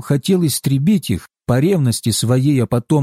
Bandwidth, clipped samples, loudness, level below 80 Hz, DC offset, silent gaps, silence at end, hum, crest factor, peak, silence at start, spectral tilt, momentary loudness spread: 16 kHz; under 0.1%; -16 LUFS; -46 dBFS; under 0.1%; none; 0 s; none; 10 dB; -6 dBFS; 0 s; -6 dB/octave; 4 LU